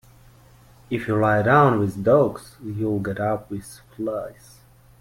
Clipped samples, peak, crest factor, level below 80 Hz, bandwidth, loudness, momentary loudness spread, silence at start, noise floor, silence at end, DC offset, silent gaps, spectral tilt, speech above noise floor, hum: under 0.1%; -2 dBFS; 20 dB; -52 dBFS; 16.5 kHz; -21 LUFS; 18 LU; 0.9 s; -51 dBFS; 0.7 s; under 0.1%; none; -7.5 dB/octave; 29 dB; none